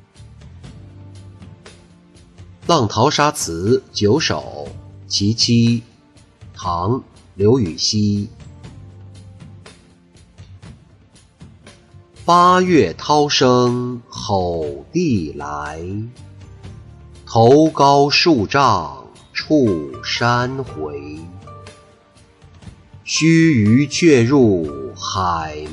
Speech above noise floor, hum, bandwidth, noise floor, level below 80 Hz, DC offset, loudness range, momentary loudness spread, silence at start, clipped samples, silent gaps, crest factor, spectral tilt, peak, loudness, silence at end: 34 dB; none; 12 kHz; -49 dBFS; -46 dBFS; under 0.1%; 8 LU; 17 LU; 0.2 s; under 0.1%; none; 16 dB; -5 dB/octave; -2 dBFS; -16 LUFS; 0 s